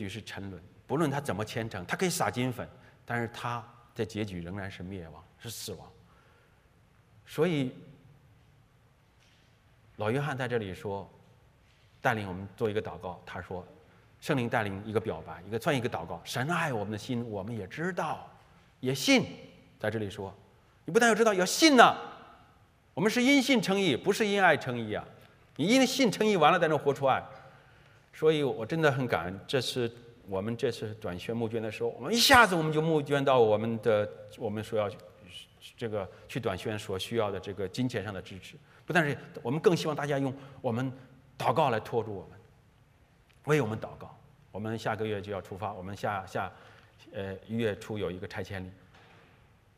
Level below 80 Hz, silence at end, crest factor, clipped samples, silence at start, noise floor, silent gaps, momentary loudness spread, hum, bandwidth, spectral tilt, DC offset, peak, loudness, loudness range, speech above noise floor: -66 dBFS; 1.05 s; 26 dB; under 0.1%; 0 s; -63 dBFS; none; 18 LU; none; 15.5 kHz; -4.5 dB/octave; under 0.1%; -4 dBFS; -29 LUFS; 12 LU; 34 dB